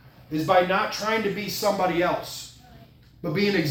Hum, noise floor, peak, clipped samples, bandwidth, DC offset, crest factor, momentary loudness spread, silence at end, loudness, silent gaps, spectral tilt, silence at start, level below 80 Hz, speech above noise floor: none; -50 dBFS; -6 dBFS; under 0.1%; 17.5 kHz; under 0.1%; 20 dB; 15 LU; 0 s; -24 LUFS; none; -4.5 dB/octave; 0.05 s; -56 dBFS; 27 dB